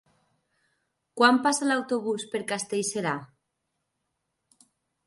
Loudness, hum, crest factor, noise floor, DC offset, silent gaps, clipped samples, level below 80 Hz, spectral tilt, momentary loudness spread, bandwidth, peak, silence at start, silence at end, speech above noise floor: -26 LUFS; none; 24 dB; -80 dBFS; under 0.1%; none; under 0.1%; -78 dBFS; -3 dB/octave; 11 LU; 11.5 kHz; -6 dBFS; 1.15 s; 1.8 s; 55 dB